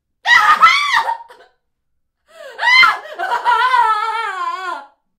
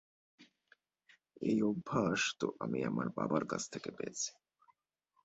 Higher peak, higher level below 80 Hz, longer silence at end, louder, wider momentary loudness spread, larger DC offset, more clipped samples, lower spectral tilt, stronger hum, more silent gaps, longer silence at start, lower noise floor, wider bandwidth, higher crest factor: first, 0 dBFS vs -18 dBFS; first, -60 dBFS vs -72 dBFS; second, 0.35 s vs 0.95 s; first, -13 LUFS vs -37 LUFS; first, 15 LU vs 8 LU; neither; neither; second, 0.5 dB/octave vs -4.5 dB/octave; neither; neither; second, 0.25 s vs 0.4 s; second, -68 dBFS vs -79 dBFS; first, 16 kHz vs 8 kHz; about the same, 16 dB vs 20 dB